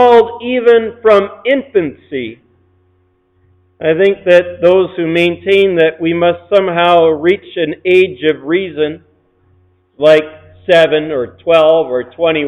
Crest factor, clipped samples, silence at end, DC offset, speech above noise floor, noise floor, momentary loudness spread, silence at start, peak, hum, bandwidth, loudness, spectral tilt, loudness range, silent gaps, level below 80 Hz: 12 dB; under 0.1%; 0 s; under 0.1%; 45 dB; -56 dBFS; 10 LU; 0 s; 0 dBFS; none; 9 kHz; -12 LUFS; -6.5 dB/octave; 4 LU; none; -54 dBFS